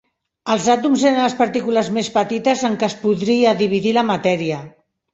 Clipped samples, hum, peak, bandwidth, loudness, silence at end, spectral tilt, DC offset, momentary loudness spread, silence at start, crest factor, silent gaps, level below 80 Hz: under 0.1%; none; -2 dBFS; 8.2 kHz; -18 LUFS; 0.45 s; -5 dB/octave; under 0.1%; 6 LU; 0.45 s; 16 dB; none; -60 dBFS